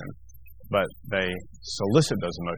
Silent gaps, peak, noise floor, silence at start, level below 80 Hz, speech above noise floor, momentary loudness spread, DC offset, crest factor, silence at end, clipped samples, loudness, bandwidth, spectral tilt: none; -6 dBFS; -50 dBFS; 0 s; -52 dBFS; 24 dB; 13 LU; 0.5%; 22 dB; 0 s; under 0.1%; -27 LUFS; 19 kHz; -5 dB/octave